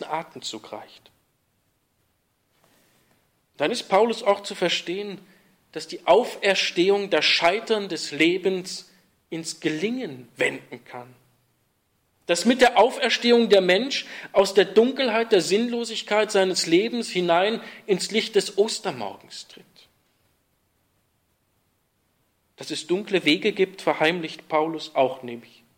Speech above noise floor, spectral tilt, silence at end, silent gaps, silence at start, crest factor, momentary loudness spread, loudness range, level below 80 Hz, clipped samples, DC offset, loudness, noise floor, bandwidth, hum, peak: 47 dB; -3.5 dB/octave; 0.35 s; none; 0 s; 18 dB; 18 LU; 11 LU; -68 dBFS; under 0.1%; under 0.1%; -22 LUFS; -70 dBFS; 16.5 kHz; none; -6 dBFS